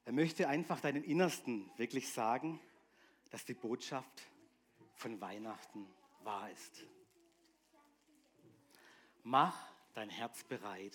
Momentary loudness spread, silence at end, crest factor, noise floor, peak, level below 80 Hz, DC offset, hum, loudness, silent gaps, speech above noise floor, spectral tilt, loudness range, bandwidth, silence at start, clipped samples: 20 LU; 0.05 s; 26 dB; -73 dBFS; -16 dBFS; under -90 dBFS; under 0.1%; none; -40 LUFS; none; 33 dB; -5 dB/octave; 14 LU; 18 kHz; 0.05 s; under 0.1%